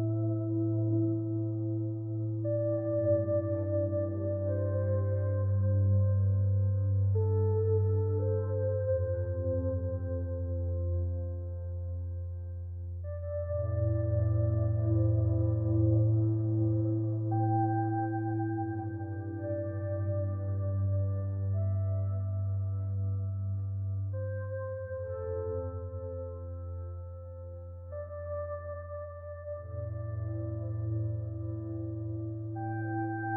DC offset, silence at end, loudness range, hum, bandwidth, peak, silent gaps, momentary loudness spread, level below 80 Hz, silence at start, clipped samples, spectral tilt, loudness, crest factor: under 0.1%; 0 s; 10 LU; none; 1.9 kHz; -18 dBFS; none; 11 LU; -56 dBFS; 0 s; under 0.1%; -14 dB/octave; -32 LUFS; 14 dB